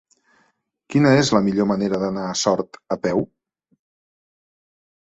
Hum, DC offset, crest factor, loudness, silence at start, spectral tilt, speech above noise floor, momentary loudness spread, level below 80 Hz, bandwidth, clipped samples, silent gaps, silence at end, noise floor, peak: none; under 0.1%; 20 dB; -20 LUFS; 0.9 s; -5.5 dB/octave; 47 dB; 10 LU; -56 dBFS; 8.2 kHz; under 0.1%; none; 1.8 s; -66 dBFS; -2 dBFS